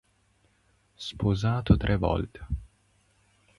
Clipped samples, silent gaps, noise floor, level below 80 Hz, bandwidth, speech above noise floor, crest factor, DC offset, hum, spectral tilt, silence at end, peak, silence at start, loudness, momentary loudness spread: under 0.1%; none; -67 dBFS; -38 dBFS; 11.5 kHz; 41 dB; 22 dB; under 0.1%; 50 Hz at -40 dBFS; -7.5 dB/octave; 0.95 s; -8 dBFS; 1 s; -28 LUFS; 14 LU